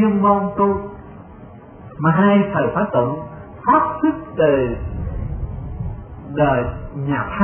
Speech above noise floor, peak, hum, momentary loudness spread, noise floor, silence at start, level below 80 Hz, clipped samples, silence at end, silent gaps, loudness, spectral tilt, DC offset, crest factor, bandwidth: 22 dB; -2 dBFS; none; 19 LU; -39 dBFS; 0 s; -34 dBFS; under 0.1%; 0 s; none; -19 LUFS; -12.5 dB/octave; under 0.1%; 16 dB; 3.4 kHz